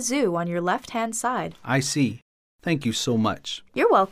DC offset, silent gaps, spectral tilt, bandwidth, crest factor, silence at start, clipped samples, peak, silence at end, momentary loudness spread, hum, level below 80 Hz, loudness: under 0.1%; 2.22-2.59 s; -4.5 dB/octave; 15.5 kHz; 18 dB; 0 s; under 0.1%; -6 dBFS; 0 s; 9 LU; none; -60 dBFS; -25 LUFS